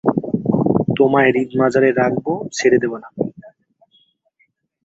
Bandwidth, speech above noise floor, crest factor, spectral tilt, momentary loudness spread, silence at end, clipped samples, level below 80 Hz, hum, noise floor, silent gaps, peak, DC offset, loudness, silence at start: 8 kHz; 48 dB; 16 dB; -6.5 dB/octave; 11 LU; 1.35 s; under 0.1%; -54 dBFS; none; -64 dBFS; none; -2 dBFS; under 0.1%; -17 LUFS; 0.05 s